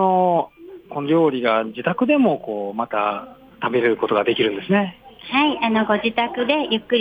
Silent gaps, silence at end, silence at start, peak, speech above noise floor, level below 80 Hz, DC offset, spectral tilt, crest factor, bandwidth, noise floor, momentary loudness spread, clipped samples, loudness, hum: none; 0 s; 0 s; -6 dBFS; 20 dB; -60 dBFS; under 0.1%; -8 dB/octave; 14 dB; 15 kHz; -39 dBFS; 10 LU; under 0.1%; -20 LUFS; none